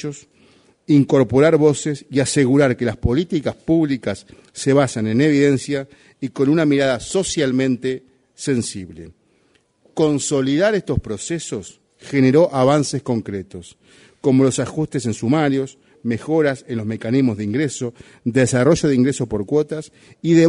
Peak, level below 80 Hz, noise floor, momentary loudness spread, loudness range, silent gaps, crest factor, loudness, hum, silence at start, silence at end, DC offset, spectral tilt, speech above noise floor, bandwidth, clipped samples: -2 dBFS; -44 dBFS; -60 dBFS; 15 LU; 5 LU; none; 16 dB; -18 LUFS; none; 0 s; 0 s; under 0.1%; -6 dB/octave; 42 dB; 11 kHz; under 0.1%